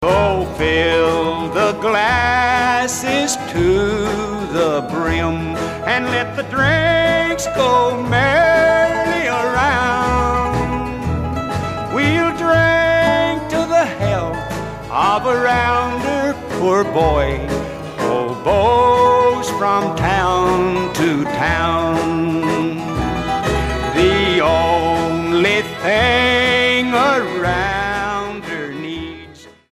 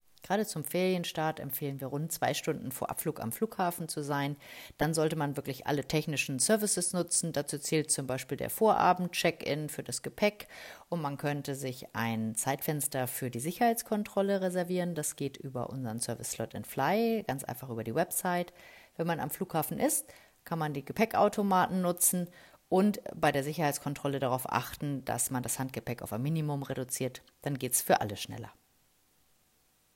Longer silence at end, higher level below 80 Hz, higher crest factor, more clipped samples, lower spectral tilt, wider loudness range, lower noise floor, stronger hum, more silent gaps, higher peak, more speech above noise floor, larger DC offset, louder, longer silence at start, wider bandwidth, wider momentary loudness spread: second, 0.2 s vs 1.45 s; first, -32 dBFS vs -66 dBFS; second, 14 dB vs 20 dB; neither; about the same, -5 dB/octave vs -4 dB/octave; about the same, 3 LU vs 5 LU; second, -40 dBFS vs -70 dBFS; neither; neither; first, -2 dBFS vs -12 dBFS; second, 24 dB vs 38 dB; neither; first, -16 LUFS vs -32 LUFS; second, 0 s vs 0.25 s; about the same, 15.5 kHz vs 16.5 kHz; about the same, 9 LU vs 10 LU